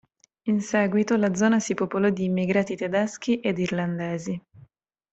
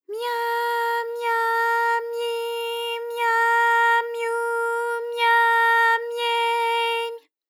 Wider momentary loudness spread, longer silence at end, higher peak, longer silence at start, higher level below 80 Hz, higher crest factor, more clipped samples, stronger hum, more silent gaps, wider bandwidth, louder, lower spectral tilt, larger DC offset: about the same, 8 LU vs 10 LU; first, 0.55 s vs 0.3 s; about the same, -8 dBFS vs -10 dBFS; first, 0.45 s vs 0.1 s; first, -64 dBFS vs under -90 dBFS; first, 18 dB vs 12 dB; neither; neither; neither; second, 8.2 kHz vs 18 kHz; second, -25 LUFS vs -21 LUFS; first, -6 dB/octave vs 3.5 dB/octave; neither